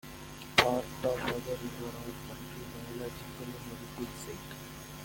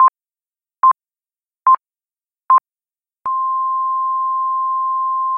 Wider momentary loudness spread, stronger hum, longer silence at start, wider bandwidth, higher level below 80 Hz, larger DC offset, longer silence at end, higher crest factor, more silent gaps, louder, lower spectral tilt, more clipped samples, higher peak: first, 16 LU vs 5 LU; neither; about the same, 0.05 s vs 0 s; first, 17 kHz vs 2.7 kHz; first, -56 dBFS vs -76 dBFS; neither; about the same, 0 s vs 0 s; first, 30 dB vs 14 dB; neither; second, -35 LUFS vs -17 LUFS; about the same, -4 dB/octave vs -5 dB/octave; neither; about the same, -6 dBFS vs -4 dBFS